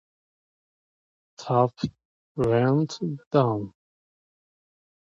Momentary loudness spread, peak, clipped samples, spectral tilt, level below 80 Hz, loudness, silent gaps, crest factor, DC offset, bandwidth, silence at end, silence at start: 16 LU; -6 dBFS; under 0.1%; -7.5 dB/octave; -58 dBFS; -25 LUFS; 2.05-2.35 s, 3.26-3.31 s; 22 dB; under 0.1%; 7.8 kHz; 1.35 s; 1.4 s